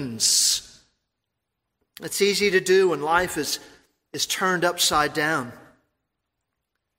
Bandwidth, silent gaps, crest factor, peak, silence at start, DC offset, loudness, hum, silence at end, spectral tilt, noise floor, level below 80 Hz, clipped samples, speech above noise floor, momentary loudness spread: 16 kHz; none; 20 dB; -6 dBFS; 0 s; under 0.1%; -21 LUFS; none; 1.4 s; -2 dB/octave; -81 dBFS; -56 dBFS; under 0.1%; 59 dB; 12 LU